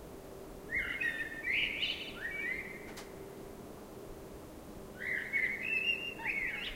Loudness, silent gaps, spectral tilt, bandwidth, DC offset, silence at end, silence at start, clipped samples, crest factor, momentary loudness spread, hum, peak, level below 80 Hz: -35 LUFS; none; -3 dB/octave; 16 kHz; under 0.1%; 0 s; 0 s; under 0.1%; 18 dB; 17 LU; none; -22 dBFS; -58 dBFS